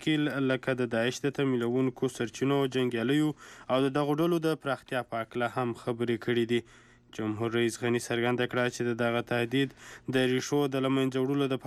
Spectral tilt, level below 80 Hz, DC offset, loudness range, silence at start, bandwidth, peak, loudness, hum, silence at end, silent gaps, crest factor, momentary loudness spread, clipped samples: -5.5 dB/octave; -68 dBFS; under 0.1%; 2 LU; 0 s; 14 kHz; -16 dBFS; -29 LUFS; none; 0 s; none; 14 dB; 5 LU; under 0.1%